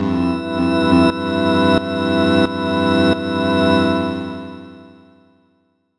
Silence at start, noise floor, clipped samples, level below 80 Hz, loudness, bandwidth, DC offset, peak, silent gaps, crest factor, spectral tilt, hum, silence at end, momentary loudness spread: 0 s; -62 dBFS; under 0.1%; -50 dBFS; -16 LUFS; 11 kHz; under 0.1%; -2 dBFS; none; 16 dB; -7 dB/octave; none; 1.1 s; 10 LU